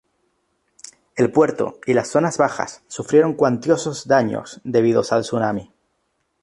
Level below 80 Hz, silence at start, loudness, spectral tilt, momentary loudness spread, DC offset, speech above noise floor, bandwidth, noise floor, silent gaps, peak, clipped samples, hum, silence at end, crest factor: -60 dBFS; 1.15 s; -19 LUFS; -5.5 dB/octave; 11 LU; under 0.1%; 51 dB; 11.5 kHz; -70 dBFS; none; -2 dBFS; under 0.1%; none; 0.8 s; 18 dB